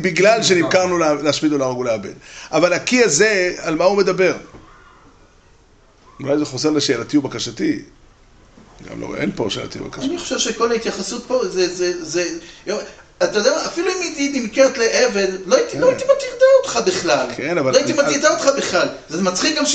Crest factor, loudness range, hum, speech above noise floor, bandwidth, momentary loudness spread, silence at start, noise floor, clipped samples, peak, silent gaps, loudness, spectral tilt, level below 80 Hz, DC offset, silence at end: 16 dB; 7 LU; none; 33 dB; 9 kHz; 12 LU; 0 s; -51 dBFS; under 0.1%; -2 dBFS; none; -17 LUFS; -3.5 dB/octave; -50 dBFS; under 0.1%; 0 s